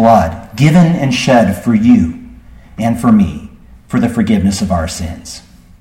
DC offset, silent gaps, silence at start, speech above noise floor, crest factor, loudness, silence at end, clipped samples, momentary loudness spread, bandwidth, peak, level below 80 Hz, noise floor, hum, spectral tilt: under 0.1%; none; 0 s; 25 dB; 12 dB; -12 LUFS; 0.4 s; under 0.1%; 16 LU; 15.5 kHz; 0 dBFS; -34 dBFS; -36 dBFS; none; -6.5 dB/octave